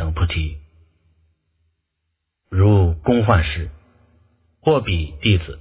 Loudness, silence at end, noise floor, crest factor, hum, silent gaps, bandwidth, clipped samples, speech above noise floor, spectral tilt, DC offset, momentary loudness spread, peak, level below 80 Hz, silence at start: -19 LUFS; 0 s; -76 dBFS; 20 dB; none; none; 4 kHz; under 0.1%; 59 dB; -11 dB/octave; under 0.1%; 13 LU; 0 dBFS; -28 dBFS; 0 s